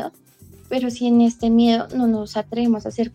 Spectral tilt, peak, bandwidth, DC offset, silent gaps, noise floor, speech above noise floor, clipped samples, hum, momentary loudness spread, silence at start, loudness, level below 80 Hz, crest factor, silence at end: -6 dB/octave; -6 dBFS; 9 kHz; under 0.1%; none; -48 dBFS; 29 dB; under 0.1%; none; 9 LU; 0 s; -19 LUFS; -50 dBFS; 14 dB; 0.05 s